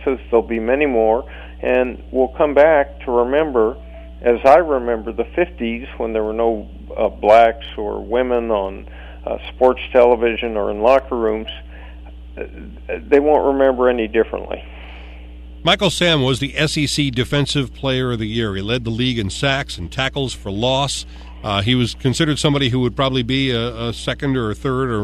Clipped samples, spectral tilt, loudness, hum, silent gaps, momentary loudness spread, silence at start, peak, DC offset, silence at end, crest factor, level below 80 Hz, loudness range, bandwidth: under 0.1%; -5.5 dB/octave; -18 LUFS; none; none; 18 LU; 0 s; 0 dBFS; under 0.1%; 0 s; 18 dB; -36 dBFS; 3 LU; 13.5 kHz